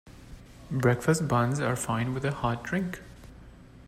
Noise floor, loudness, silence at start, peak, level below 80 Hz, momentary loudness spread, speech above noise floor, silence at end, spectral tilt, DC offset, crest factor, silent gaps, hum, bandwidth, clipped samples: -49 dBFS; -28 LUFS; 0.05 s; -10 dBFS; -50 dBFS; 11 LU; 22 dB; 0 s; -6 dB/octave; under 0.1%; 20 dB; none; none; 15.5 kHz; under 0.1%